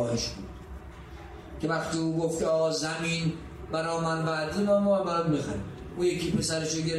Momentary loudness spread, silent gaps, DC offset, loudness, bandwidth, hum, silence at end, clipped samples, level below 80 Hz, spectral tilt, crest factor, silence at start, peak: 18 LU; none; under 0.1%; -28 LUFS; 13.5 kHz; none; 0 s; under 0.1%; -50 dBFS; -5 dB/octave; 16 dB; 0 s; -14 dBFS